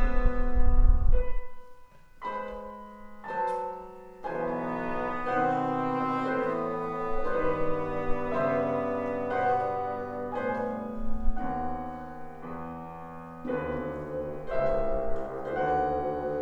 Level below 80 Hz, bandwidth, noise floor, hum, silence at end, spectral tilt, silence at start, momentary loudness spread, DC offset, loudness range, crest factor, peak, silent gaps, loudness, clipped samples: -32 dBFS; 4.5 kHz; -49 dBFS; none; 0 s; -8.5 dB/octave; 0 s; 14 LU; under 0.1%; 6 LU; 18 dB; -8 dBFS; none; -31 LUFS; under 0.1%